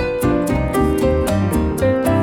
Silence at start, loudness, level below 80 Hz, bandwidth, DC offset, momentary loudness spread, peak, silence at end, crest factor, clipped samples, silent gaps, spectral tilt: 0 s; -17 LUFS; -28 dBFS; 19 kHz; under 0.1%; 2 LU; -6 dBFS; 0 s; 12 dB; under 0.1%; none; -7 dB/octave